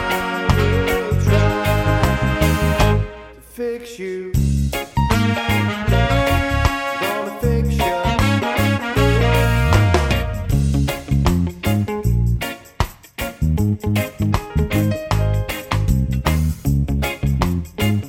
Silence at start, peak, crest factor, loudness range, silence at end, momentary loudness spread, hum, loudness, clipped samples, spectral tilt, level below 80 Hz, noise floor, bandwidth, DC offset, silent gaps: 0 s; 0 dBFS; 16 dB; 4 LU; 0 s; 7 LU; none; -19 LUFS; under 0.1%; -6 dB/octave; -24 dBFS; -37 dBFS; 17 kHz; under 0.1%; none